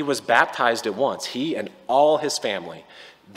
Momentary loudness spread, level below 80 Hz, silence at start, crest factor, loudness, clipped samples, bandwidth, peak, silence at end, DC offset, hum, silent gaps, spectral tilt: 12 LU; -72 dBFS; 0 s; 20 dB; -22 LUFS; under 0.1%; 16 kHz; -2 dBFS; 0.05 s; under 0.1%; none; none; -3 dB/octave